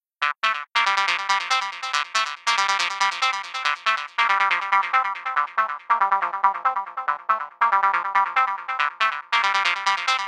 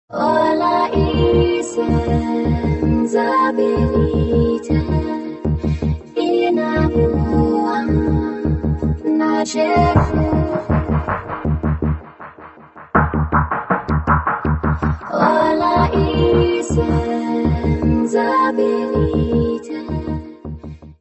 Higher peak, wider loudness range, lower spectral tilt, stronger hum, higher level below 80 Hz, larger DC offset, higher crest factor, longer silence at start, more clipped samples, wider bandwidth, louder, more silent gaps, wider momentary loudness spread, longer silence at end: second, -4 dBFS vs 0 dBFS; about the same, 1 LU vs 3 LU; second, 2 dB/octave vs -7.5 dB/octave; neither; second, under -90 dBFS vs -28 dBFS; neither; about the same, 18 dB vs 16 dB; about the same, 0.2 s vs 0.1 s; neither; first, 13 kHz vs 8.4 kHz; second, -22 LUFS vs -17 LUFS; neither; about the same, 5 LU vs 7 LU; about the same, 0 s vs 0.1 s